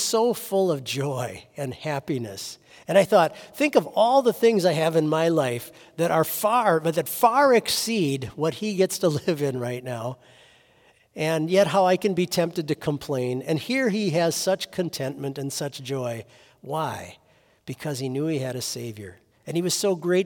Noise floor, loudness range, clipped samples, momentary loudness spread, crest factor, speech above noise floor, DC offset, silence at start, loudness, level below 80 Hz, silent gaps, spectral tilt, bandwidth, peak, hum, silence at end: -59 dBFS; 9 LU; under 0.1%; 14 LU; 18 dB; 36 dB; under 0.1%; 0 s; -24 LUFS; -66 dBFS; none; -4.5 dB/octave; 18 kHz; -6 dBFS; none; 0 s